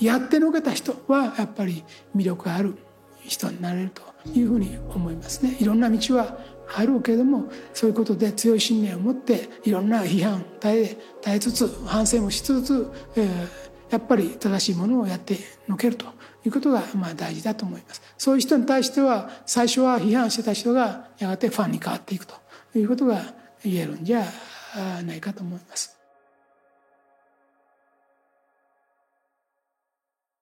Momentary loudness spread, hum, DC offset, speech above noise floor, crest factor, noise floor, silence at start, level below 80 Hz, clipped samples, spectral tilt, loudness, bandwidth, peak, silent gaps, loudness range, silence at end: 12 LU; none; under 0.1%; 63 dB; 18 dB; -86 dBFS; 0 s; -50 dBFS; under 0.1%; -5 dB/octave; -24 LUFS; 16.5 kHz; -6 dBFS; none; 8 LU; 4.55 s